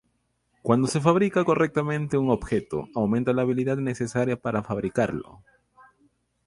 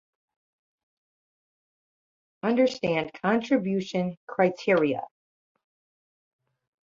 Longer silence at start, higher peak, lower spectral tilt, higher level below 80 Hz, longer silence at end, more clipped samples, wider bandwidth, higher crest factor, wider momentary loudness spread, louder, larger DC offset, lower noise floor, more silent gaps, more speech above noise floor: second, 0.65 s vs 2.45 s; first, -4 dBFS vs -8 dBFS; about the same, -7 dB/octave vs -6.5 dB/octave; first, -52 dBFS vs -70 dBFS; second, 1.1 s vs 1.8 s; neither; first, 11.5 kHz vs 7.6 kHz; about the same, 22 dB vs 20 dB; about the same, 7 LU vs 8 LU; about the same, -25 LUFS vs -26 LUFS; neither; second, -72 dBFS vs under -90 dBFS; second, none vs 4.17-4.27 s; second, 48 dB vs over 65 dB